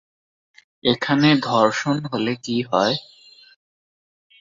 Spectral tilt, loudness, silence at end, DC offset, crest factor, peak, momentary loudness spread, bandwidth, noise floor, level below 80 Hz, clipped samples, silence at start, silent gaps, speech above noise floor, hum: -5.5 dB/octave; -20 LUFS; 1.4 s; under 0.1%; 20 dB; -2 dBFS; 8 LU; 7.6 kHz; under -90 dBFS; -62 dBFS; under 0.1%; 0.85 s; none; over 71 dB; none